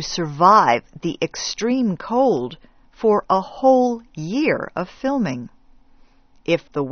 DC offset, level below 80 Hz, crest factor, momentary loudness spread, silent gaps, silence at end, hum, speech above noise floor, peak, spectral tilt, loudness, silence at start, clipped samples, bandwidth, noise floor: under 0.1%; -52 dBFS; 18 dB; 14 LU; none; 0 s; none; 32 dB; -2 dBFS; -4.5 dB/octave; -19 LUFS; 0 s; under 0.1%; 6.6 kHz; -51 dBFS